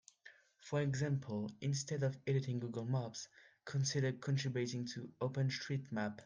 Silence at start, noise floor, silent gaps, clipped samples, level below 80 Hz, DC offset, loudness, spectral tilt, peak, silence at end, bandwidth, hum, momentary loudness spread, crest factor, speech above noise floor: 0.25 s; -64 dBFS; none; under 0.1%; -78 dBFS; under 0.1%; -40 LUFS; -5.5 dB/octave; -24 dBFS; 0 s; 9.8 kHz; none; 9 LU; 14 dB; 25 dB